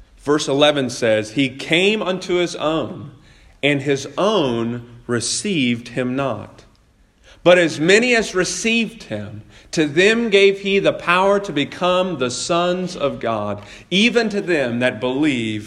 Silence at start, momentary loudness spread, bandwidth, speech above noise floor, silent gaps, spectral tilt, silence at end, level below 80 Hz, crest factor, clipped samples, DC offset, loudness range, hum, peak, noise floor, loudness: 0 s; 11 LU; 12 kHz; 36 dB; none; -4 dB/octave; 0 s; -52 dBFS; 18 dB; under 0.1%; under 0.1%; 4 LU; none; 0 dBFS; -54 dBFS; -18 LUFS